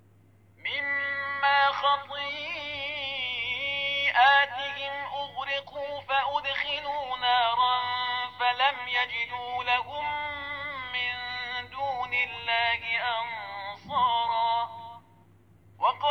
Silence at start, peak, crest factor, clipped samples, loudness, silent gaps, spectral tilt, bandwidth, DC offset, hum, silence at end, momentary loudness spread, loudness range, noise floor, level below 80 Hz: 0.65 s; -10 dBFS; 20 dB; under 0.1%; -27 LUFS; none; -3 dB/octave; 6.6 kHz; under 0.1%; none; 0 s; 10 LU; 3 LU; -59 dBFS; -64 dBFS